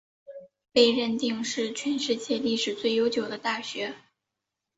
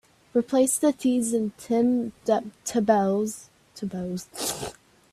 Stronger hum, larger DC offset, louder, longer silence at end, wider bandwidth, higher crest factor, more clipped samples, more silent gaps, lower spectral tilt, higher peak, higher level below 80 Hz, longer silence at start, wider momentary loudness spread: neither; neither; about the same, -27 LUFS vs -25 LUFS; first, 0.8 s vs 0.4 s; second, 8 kHz vs 15 kHz; about the same, 22 dB vs 18 dB; neither; neither; second, -3 dB/octave vs -4.5 dB/octave; about the same, -6 dBFS vs -8 dBFS; second, -70 dBFS vs -62 dBFS; about the same, 0.3 s vs 0.35 s; about the same, 13 LU vs 12 LU